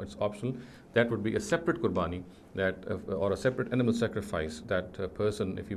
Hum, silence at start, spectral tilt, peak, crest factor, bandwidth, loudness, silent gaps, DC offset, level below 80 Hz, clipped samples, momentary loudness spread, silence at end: none; 0 s; -6 dB/octave; -12 dBFS; 20 dB; 13.5 kHz; -32 LUFS; none; under 0.1%; -52 dBFS; under 0.1%; 9 LU; 0 s